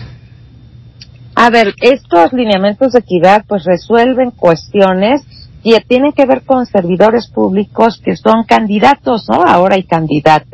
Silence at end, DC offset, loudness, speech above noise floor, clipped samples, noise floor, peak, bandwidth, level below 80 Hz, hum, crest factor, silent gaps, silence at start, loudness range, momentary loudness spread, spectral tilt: 0.15 s; under 0.1%; -10 LUFS; 27 dB; 2%; -37 dBFS; 0 dBFS; 8 kHz; -42 dBFS; none; 10 dB; none; 0 s; 1 LU; 5 LU; -6.5 dB/octave